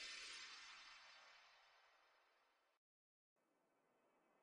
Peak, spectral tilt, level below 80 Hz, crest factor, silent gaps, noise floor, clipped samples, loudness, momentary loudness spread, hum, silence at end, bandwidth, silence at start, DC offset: -44 dBFS; 2 dB/octave; under -90 dBFS; 20 dB; 2.77-3.36 s; -85 dBFS; under 0.1%; -57 LUFS; 15 LU; none; 0 s; 10.5 kHz; 0 s; under 0.1%